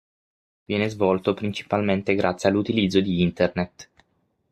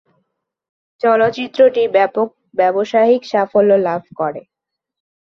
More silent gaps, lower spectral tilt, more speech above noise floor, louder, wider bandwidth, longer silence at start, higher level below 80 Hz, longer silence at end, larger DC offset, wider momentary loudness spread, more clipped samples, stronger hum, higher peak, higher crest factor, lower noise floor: neither; about the same, -6.5 dB/octave vs -6.5 dB/octave; second, 47 dB vs 58 dB; second, -23 LUFS vs -15 LUFS; first, 10.5 kHz vs 7 kHz; second, 0.7 s vs 1.05 s; first, -58 dBFS vs -64 dBFS; about the same, 0.7 s vs 0.8 s; neither; about the same, 7 LU vs 9 LU; neither; neither; about the same, -4 dBFS vs -2 dBFS; about the same, 18 dB vs 14 dB; about the same, -69 dBFS vs -72 dBFS